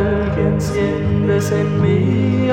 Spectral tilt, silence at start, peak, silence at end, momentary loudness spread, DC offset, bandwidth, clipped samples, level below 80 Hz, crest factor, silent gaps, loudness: -7.5 dB/octave; 0 s; -2 dBFS; 0 s; 2 LU; under 0.1%; 15.5 kHz; under 0.1%; -32 dBFS; 12 dB; none; -17 LUFS